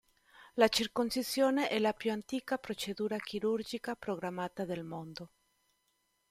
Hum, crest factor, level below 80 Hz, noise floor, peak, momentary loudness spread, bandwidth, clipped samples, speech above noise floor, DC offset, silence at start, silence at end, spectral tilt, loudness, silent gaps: none; 22 dB; -70 dBFS; -78 dBFS; -12 dBFS; 14 LU; 16 kHz; under 0.1%; 44 dB; under 0.1%; 0.4 s; 1.05 s; -4 dB/octave; -34 LUFS; none